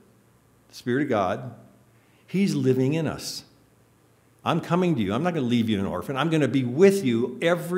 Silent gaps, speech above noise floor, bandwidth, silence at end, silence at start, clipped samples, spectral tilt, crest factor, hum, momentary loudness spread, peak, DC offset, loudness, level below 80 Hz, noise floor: none; 36 dB; 16 kHz; 0 s; 0.75 s; under 0.1%; -6.5 dB/octave; 20 dB; none; 13 LU; -4 dBFS; under 0.1%; -24 LUFS; -62 dBFS; -59 dBFS